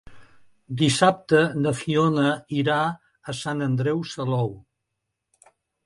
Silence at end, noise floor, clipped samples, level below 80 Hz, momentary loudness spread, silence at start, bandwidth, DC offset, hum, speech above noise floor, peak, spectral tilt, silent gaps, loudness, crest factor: 1.25 s; -81 dBFS; under 0.1%; -58 dBFS; 12 LU; 0.05 s; 11.5 kHz; under 0.1%; none; 58 dB; -4 dBFS; -5.5 dB/octave; none; -23 LUFS; 22 dB